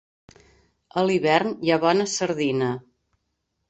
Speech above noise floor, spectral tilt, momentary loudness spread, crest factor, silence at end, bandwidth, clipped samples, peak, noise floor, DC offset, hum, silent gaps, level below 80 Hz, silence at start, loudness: 54 dB; -4.5 dB/octave; 8 LU; 20 dB; 0.9 s; 8.2 kHz; under 0.1%; -6 dBFS; -76 dBFS; under 0.1%; none; none; -64 dBFS; 0.95 s; -22 LUFS